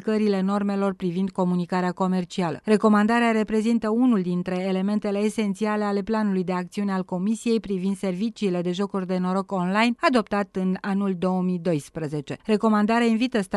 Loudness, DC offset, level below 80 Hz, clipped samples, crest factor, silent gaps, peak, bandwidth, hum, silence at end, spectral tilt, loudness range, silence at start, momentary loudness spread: -24 LUFS; under 0.1%; -60 dBFS; under 0.1%; 16 dB; none; -6 dBFS; 12 kHz; none; 0 s; -7 dB/octave; 3 LU; 0 s; 7 LU